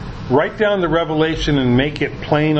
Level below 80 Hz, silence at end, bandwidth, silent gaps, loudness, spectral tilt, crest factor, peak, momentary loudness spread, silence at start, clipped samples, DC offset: -34 dBFS; 0 s; 8.2 kHz; none; -17 LUFS; -7 dB/octave; 16 dB; 0 dBFS; 3 LU; 0 s; under 0.1%; under 0.1%